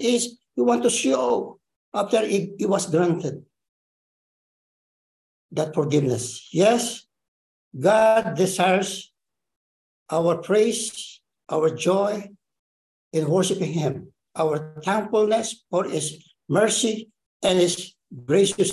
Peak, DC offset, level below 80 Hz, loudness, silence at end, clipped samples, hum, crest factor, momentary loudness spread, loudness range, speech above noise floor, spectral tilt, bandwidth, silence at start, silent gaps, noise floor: -6 dBFS; under 0.1%; -66 dBFS; -22 LUFS; 0 s; under 0.1%; none; 18 dB; 13 LU; 4 LU; over 68 dB; -4.5 dB/octave; 13 kHz; 0 s; 1.76-1.92 s, 3.69-5.49 s, 7.28-7.71 s, 9.56-10.06 s, 12.59-13.11 s, 17.26-17.40 s; under -90 dBFS